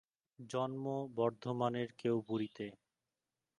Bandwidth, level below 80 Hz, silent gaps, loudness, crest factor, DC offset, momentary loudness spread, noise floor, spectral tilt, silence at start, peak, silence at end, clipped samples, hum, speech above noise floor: 11 kHz; -80 dBFS; none; -39 LUFS; 20 dB; under 0.1%; 9 LU; under -90 dBFS; -7 dB/octave; 0.4 s; -20 dBFS; 0.85 s; under 0.1%; none; over 52 dB